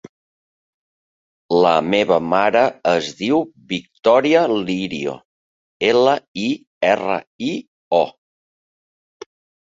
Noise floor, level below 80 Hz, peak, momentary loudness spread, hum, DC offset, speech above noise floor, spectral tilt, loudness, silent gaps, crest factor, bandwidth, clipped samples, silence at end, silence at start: under -90 dBFS; -60 dBFS; -2 dBFS; 11 LU; none; under 0.1%; over 73 dB; -5 dB/octave; -18 LUFS; 5.25-5.80 s, 6.28-6.34 s, 6.67-6.81 s, 7.27-7.39 s, 7.68-7.91 s; 18 dB; 7.8 kHz; under 0.1%; 1.6 s; 1.5 s